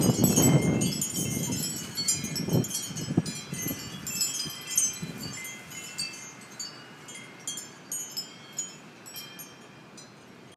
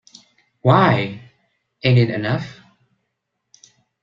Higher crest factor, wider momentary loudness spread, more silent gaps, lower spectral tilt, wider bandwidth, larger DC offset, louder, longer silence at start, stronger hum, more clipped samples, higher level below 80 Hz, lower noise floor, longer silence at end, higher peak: about the same, 22 dB vs 20 dB; first, 19 LU vs 16 LU; neither; second, -3.5 dB/octave vs -7.5 dB/octave; first, 15.5 kHz vs 7.2 kHz; neither; second, -29 LUFS vs -18 LUFS; second, 0 s vs 0.65 s; neither; neither; second, -58 dBFS vs -52 dBFS; second, -50 dBFS vs -76 dBFS; second, 0 s vs 1.5 s; second, -8 dBFS vs -2 dBFS